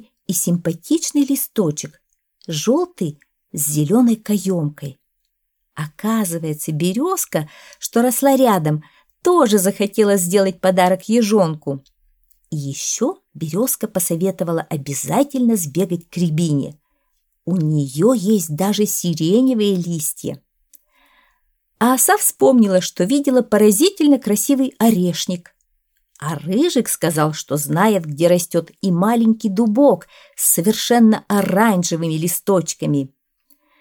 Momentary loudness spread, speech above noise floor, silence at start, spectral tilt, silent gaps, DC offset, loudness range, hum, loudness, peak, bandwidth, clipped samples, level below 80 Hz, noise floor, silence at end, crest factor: 12 LU; 55 dB; 0.3 s; -5 dB/octave; none; under 0.1%; 5 LU; none; -17 LUFS; -2 dBFS; 19.5 kHz; under 0.1%; -64 dBFS; -72 dBFS; 0.75 s; 16 dB